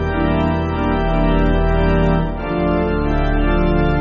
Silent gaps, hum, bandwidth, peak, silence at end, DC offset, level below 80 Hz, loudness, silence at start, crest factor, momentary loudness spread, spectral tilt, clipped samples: none; none; 5.6 kHz; -4 dBFS; 0 s; under 0.1%; -20 dBFS; -18 LUFS; 0 s; 12 dB; 3 LU; -6.5 dB/octave; under 0.1%